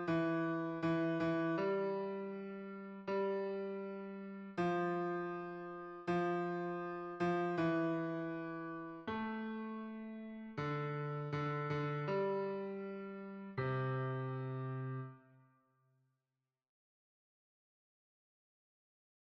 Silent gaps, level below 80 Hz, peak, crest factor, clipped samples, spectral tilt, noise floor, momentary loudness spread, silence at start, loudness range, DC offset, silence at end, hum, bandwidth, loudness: none; -76 dBFS; -26 dBFS; 14 dB; under 0.1%; -8.5 dB/octave; under -90 dBFS; 11 LU; 0 s; 5 LU; under 0.1%; 4.1 s; none; 7.6 kHz; -40 LUFS